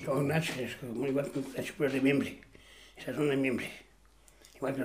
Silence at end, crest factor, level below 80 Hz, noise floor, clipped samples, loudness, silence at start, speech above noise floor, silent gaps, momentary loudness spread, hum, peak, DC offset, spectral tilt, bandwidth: 0 s; 18 dB; -64 dBFS; -61 dBFS; under 0.1%; -33 LUFS; 0 s; 30 dB; none; 14 LU; none; -14 dBFS; under 0.1%; -6 dB/octave; 15.5 kHz